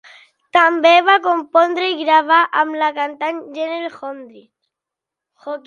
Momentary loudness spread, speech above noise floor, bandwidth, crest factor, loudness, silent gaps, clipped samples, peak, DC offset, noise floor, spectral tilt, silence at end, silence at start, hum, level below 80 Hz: 18 LU; 69 dB; 7.2 kHz; 16 dB; -15 LUFS; none; under 0.1%; 0 dBFS; under 0.1%; -85 dBFS; -2.5 dB/octave; 0.05 s; 0.55 s; none; -74 dBFS